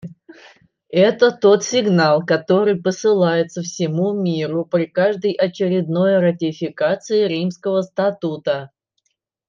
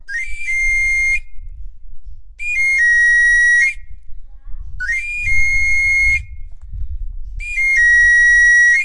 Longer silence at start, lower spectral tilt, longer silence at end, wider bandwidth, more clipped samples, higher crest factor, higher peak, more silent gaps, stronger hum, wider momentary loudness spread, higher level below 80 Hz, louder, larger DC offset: about the same, 0.05 s vs 0 s; first, -5.5 dB/octave vs 1 dB/octave; first, 0.8 s vs 0 s; second, 7.4 kHz vs 11.5 kHz; neither; about the same, 16 dB vs 12 dB; about the same, -2 dBFS vs -4 dBFS; neither; neither; second, 8 LU vs 22 LU; second, -68 dBFS vs -30 dBFS; second, -18 LUFS vs -12 LUFS; neither